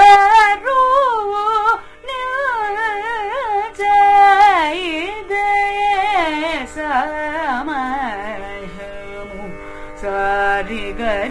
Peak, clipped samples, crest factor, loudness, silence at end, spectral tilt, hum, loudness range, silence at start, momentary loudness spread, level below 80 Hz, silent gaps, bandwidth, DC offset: 0 dBFS; under 0.1%; 16 dB; -16 LUFS; 0 s; -3.5 dB/octave; none; 9 LU; 0 s; 20 LU; -40 dBFS; none; 11 kHz; under 0.1%